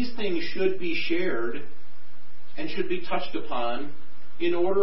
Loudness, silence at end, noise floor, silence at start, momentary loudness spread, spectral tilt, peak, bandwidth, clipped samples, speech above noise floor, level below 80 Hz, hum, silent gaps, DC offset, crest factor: -29 LUFS; 0 s; -56 dBFS; 0 s; 12 LU; -9 dB/octave; -10 dBFS; 5.8 kHz; under 0.1%; 28 dB; -60 dBFS; none; none; 10%; 16 dB